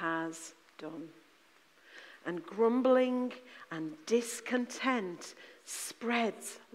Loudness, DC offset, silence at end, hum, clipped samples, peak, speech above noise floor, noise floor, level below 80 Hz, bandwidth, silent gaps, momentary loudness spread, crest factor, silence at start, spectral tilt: -34 LUFS; under 0.1%; 0.1 s; none; under 0.1%; -16 dBFS; 31 dB; -65 dBFS; -88 dBFS; 15.5 kHz; none; 20 LU; 18 dB; 0 s; -3.5 dB/octave